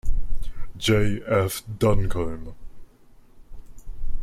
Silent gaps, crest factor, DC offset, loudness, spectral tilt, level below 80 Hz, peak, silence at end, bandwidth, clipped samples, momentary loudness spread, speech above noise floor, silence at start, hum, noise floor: none; 14 dB; under 0.1%; -25 LUFS; -5.5 dB/octave; -30 dBFS; -8 dBFS; 0 s; 14.5 kHz; under 0.1%; 19 LU; 29 dB; 0.05 s; none; -50 dBFS